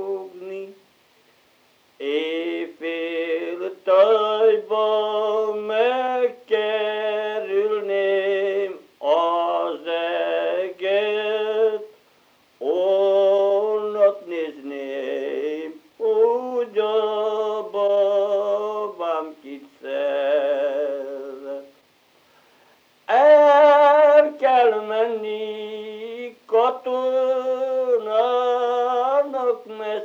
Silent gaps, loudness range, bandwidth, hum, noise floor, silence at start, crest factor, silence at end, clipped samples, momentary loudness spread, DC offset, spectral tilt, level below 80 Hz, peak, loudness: none; 9 LU; 7 kHz; none; -59 dBFS; 0 s; 18 dB; 0 s; under 0.1%; 15 LU; under 0.1%; -4.5 dB/octave; -84 dBFS; -2 dBFS; -21 LUFS